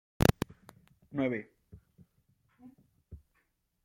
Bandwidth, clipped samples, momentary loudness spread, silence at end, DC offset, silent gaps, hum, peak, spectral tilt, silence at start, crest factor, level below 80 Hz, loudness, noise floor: 16.5 kHz; under 0.1%; 27 LU; 0.7 s; under 0.1%; none; none; -8 dBFS; -6 dB/octave; 0.2 s; 30 dB; -50 dBFS; -33 LUFS; -76 dBFS